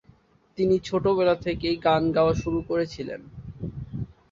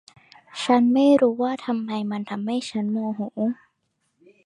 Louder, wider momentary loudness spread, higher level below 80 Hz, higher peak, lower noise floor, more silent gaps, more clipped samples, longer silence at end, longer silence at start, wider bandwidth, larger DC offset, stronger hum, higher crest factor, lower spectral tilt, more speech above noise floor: about the same, -24 LUFS vs -23 LUFS; first, 15 LU vs 12 LU; first, -46 dBFS vs -72 dBFS; about the same, -8 dBFS vs -6 dBFS; second, -58 dBFS vs -73 dBFS; neither; neither; second, 0.2 s vs 0.9 s; about the same, 0.55 s vs 0.55 s; second, 7.6 kHz vs 10.5 kHz; neither; neither; about the same, 18 dB vs 16 dB; about the same, -7 dB/octave vs -6 dB/octave; second, 34 dB vs 51 dB